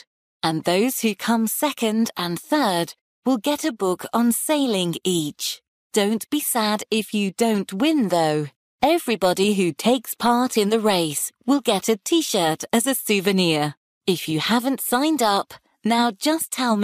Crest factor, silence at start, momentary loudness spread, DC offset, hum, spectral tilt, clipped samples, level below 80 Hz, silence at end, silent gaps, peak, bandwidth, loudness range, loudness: 14 dB; 0.45 s; 6 LU; under 0.1%; none; -4 dB/octave; under 0.1%; -64 dBFS; 0 s; 3.01-3.22 s, 5.68-5.90 s, 8.56-8.78 s, 13.77-14.01 s; -8 dBFS; 15.5 kHz; 2 LU; -21 LUFS